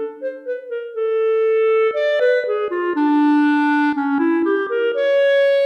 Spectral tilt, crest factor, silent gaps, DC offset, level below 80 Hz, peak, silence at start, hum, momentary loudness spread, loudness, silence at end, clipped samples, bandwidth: -4.5 dB/octave; 10 dB; none; under 0.1%; -72 dBFS; -6 dBFS; 0 s; none; 12 LU; -18 LUFS; 0 s; under 0.1%; 6.4 kHz